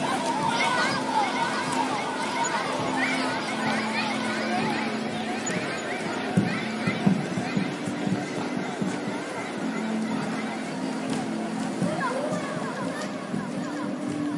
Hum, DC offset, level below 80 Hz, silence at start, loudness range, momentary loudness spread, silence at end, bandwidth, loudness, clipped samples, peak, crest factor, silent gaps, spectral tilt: none; under 0.1%; -68 dBFS; 0 s; 4 LU; 6 LU; 0 s; 11.5 kHz; -27 LUFS; under 0.1%; -8 dBFS; 20 dB; none; -4.5 dB/octave